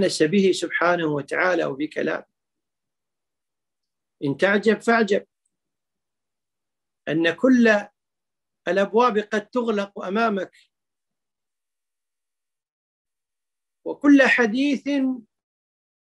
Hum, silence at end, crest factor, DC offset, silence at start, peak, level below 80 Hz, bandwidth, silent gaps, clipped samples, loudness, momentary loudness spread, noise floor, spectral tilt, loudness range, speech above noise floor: none; 0.85 s; 22 dB; under 0.1%; 0 s; -2 dBFS; -74 dBFS; 11.5 kHz; 12.72-13.05 s; under 0.1%; -21 LUFS; 12 LU; -90 dBFS; -5 dB/octave; 7 LU; 69 dB